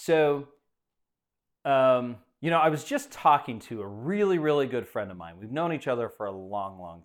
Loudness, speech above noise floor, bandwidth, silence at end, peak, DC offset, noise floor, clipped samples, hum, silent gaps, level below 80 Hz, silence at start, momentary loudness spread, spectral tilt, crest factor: -27 LUFS; 58 dB; 17.5 kHz; 0.05 s; -8 dBFS; under 0.1%; -85 dBFS; under 0.1%; none; none; -70 dBFS; 0 s; 14 LU; -6 dB/octave; 20 dB